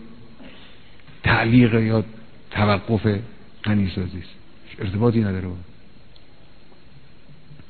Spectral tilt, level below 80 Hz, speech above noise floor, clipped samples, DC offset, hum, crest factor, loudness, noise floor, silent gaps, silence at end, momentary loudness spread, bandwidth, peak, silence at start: -10.5 dB/octave; -46 dBFS; 30 dB; under 0.1%; 1%; none; 20 dB; -21 LUFS; -50 dBFS; none; 0.15 s; 22 LU; 4.5 kHz; -4 dBFS; 0 s